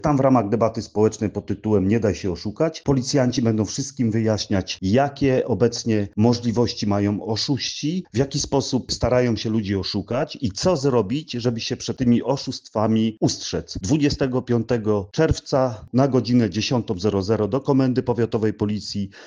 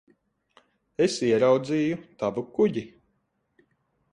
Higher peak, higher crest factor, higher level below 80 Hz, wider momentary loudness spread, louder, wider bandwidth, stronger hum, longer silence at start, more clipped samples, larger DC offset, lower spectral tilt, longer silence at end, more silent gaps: first, -4 dBFS vs -8 dBFS; about the same, 18 dB vs 18 dB; first, -46 dBFS vs -66 dBFS; second, 6 LU vs 13 LU; first, -22 LUFS vs -25 LUFS; about the same, 10 kHz vs 10.5 kHz; neither; second, 0.05 s vs 1 s; neither; neither; about the same, -6 dB/octave vs -5.5 dB/octave; second, 0 s vs 1.25 s; neither